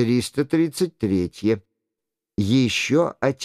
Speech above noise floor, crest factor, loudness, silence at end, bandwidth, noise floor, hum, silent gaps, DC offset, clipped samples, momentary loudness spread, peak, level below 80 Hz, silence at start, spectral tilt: 64 dB; 16 dB; -22 LUFS; 0 s; 15 kHz; -84 dBFS; none; none; under 0.1%; under 0.1%; 6 LU; -6 dBFS; -54 dBFS; 0 s; -5.5 dB/octave